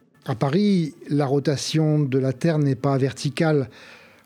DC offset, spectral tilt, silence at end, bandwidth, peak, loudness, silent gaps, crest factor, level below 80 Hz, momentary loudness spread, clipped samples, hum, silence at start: under 0.1%; -6.5 dB/octave; 0.3 s; 13 kHz; -6 dBFS; -22 LUFS; none; 16 dB; -64 dBFS; 5 LU; under 0.1%; none; 0.25 s